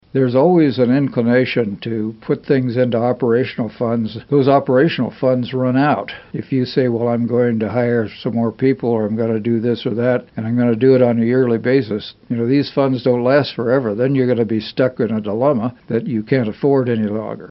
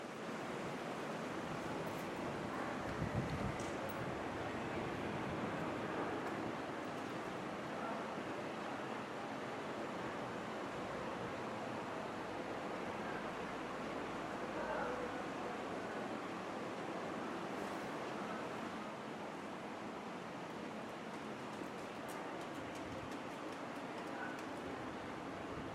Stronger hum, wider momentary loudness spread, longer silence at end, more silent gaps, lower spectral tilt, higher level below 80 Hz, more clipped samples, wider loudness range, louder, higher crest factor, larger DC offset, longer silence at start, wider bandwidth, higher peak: neither; first, 8 LU vs 5 LU; about the same, 0.05 s vs 0 s; neither; about the same, -6.5 dB/octave vs -5.5 dB/octave; first, -56 dBFS vs -66 dBFS; neither; about the same, 2 LU vs 4 LU; first, -17 LUFS vs -44 LUFS; about the same, 16 dB vs 18 dB; neither; first, 0.15 s vs 0 s; second, 5.8 kHz vs 16 kHz; first, 0 dBFS vs -26 dBFS